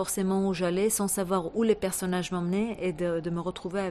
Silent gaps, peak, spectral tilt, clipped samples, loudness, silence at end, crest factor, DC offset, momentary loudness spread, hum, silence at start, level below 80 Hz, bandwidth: none; -12 dBFS; -5 dB/octave; under 0.1%; -28 LUFS; 0 s; 16 dB; under 0.1%; 6 LU; none; 0 s; -56 dBFS; 15 kHz